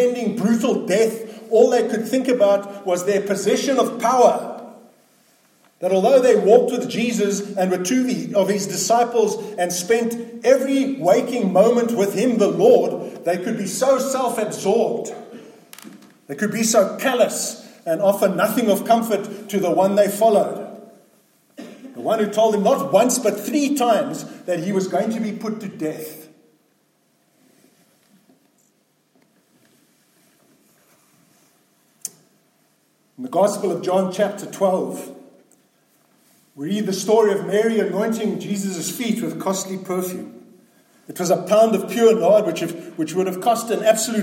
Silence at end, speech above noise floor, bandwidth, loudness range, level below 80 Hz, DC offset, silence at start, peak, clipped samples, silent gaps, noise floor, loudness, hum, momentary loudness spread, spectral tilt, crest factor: 0 s; 45 dB; 17 kHz; 7 LU; -74 dBFS; under 0.1%; 0 s; -2 dBFS; under 0.1%; none; -63 dBFS; -19 LUFS; none; 13 LU; -4.5 dB/octave; 18 dB